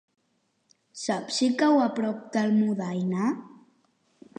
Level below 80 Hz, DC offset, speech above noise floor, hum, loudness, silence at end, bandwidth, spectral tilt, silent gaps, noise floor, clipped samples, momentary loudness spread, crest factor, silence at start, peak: -80 dBFS; under 0.1%; 47 dB; none; -26 LUFS; 0.9 s; 9.8 kHz; -5.5 dB/octave; none; -72 dBFS; under 0.1%; 10 LU; 16 dB; 0.95 s; -10 dBFS